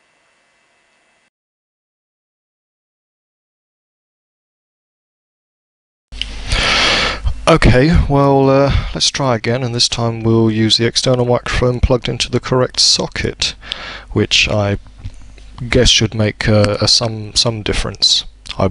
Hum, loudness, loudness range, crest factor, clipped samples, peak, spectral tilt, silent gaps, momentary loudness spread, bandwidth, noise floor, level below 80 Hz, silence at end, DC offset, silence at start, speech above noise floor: none; -13 LUFS; 5 LU; 16 dB; under 0.1%; 0 dBFS; -4 dB/octave; none; 9 LU; 11 kHz; -57 dBFS; -26 dBFS; 0 s; under 0.1%; 6.1 s; 44 dB